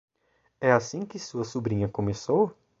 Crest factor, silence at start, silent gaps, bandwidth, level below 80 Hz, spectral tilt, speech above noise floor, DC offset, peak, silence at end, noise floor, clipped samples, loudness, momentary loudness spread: 22 dB; 0.6 s; none; 8 kHz; -54 dBFS; -6 dB/octave; 44 dB; under 0.1%; -6 dBFS; 0.3 s; -70 dBFS; under 0.1%; -27 LUFS; 11 LU